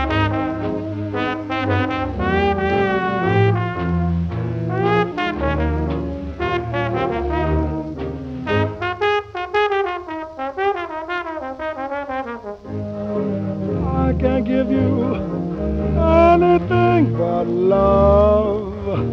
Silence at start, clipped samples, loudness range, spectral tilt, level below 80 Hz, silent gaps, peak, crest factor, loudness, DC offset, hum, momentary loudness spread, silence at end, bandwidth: 0 s; under 0.1%; 8 LU; -8.5 dB/octave; -32 dBFS; none; -2 dBFS; 18 dB; -19 LUFS; under 0.1%; none; 12 LU; 0 s; 6.8 kHz